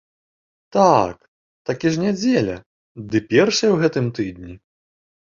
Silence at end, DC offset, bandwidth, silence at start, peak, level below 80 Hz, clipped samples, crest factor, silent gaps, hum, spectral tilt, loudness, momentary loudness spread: 0.75 s; under 0.1%; 7.6 kHz; 0.75 s; -2 dBFS; -52 dBFS; under 0.1%; 20 dB; 1.28-1.65 s, 2.66-2.95 s; none; -5.5 dB/octave; -19 LUFS; 18 LU